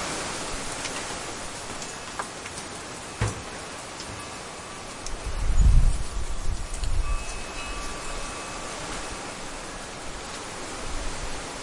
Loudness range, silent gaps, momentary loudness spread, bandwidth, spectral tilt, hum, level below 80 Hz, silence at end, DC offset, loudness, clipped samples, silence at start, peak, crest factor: 5 LU; none; 7 LU; 11.5 kHz; -3.5 dB/octave; none; -30 dBFS; 0 s; under 0.1%; -32 LUFS; under 0.1%; 0 s; -6 dBFS; 22 dB